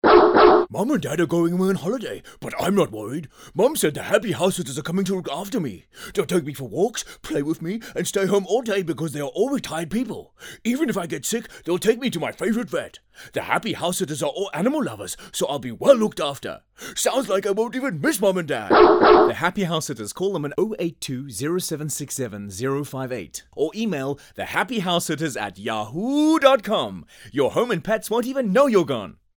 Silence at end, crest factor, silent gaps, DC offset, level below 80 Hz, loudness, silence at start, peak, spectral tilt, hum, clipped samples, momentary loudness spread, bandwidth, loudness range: 0.3 s; 20 dB; none; under 0.1%; -54 dBFS; -22 LUFS; 0.05 s; -2 dBFS; -4.5 dB/octave; none; under 0.1%; 13 LU; over 20 kHz; 7 LU